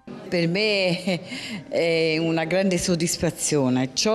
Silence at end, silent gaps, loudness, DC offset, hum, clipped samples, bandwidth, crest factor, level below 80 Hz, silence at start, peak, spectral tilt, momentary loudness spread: 0 s; none; -23 LUFS; under 0.1%; none; under 0.1%; 14.5 kHz; 12 dB; -52 dBFS; 0.05 s; -10 dBFS; -4 dB/octave; 7 LU